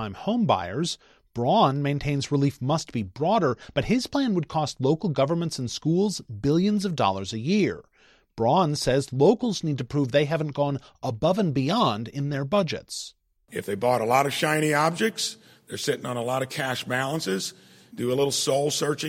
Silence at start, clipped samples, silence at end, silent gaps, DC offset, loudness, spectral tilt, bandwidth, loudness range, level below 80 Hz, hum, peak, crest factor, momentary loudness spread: 0 s; under 0.1%; 0 s; none; under 0.1%; -25 LUFS; -5 dB/octave; 16.5 kHz; 2 LU; -54 dBFS; none; -6 dBFS; 18 dB; 9 LU